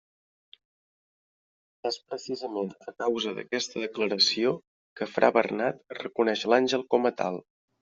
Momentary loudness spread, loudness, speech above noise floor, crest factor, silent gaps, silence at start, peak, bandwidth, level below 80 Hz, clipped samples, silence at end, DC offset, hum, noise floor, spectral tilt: 13 LU; -28 LUFS; over 63 dB; 24 dB; 4.67-4.96 s; 1.85 s; -6 dBFS; 7.6 kHz; -76 dBFS; under 0.1%; 0.4 s; under 0.1%; none; under -90 dBFS; -2 dB/octave